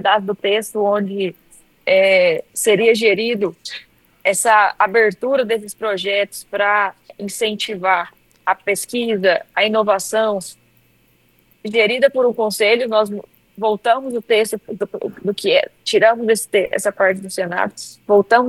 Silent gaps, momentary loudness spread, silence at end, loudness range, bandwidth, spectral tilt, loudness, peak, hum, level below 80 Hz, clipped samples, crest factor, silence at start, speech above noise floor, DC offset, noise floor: none; 11 LU; 0 s; 3 LU; 15 kHz; -3 dB/octave; -17 LUFS; 0 dBFS; none; -64 dBFS; under 0.1%; 18 dB; 0 s; 40 dB; under 0.1%; -57 dBFS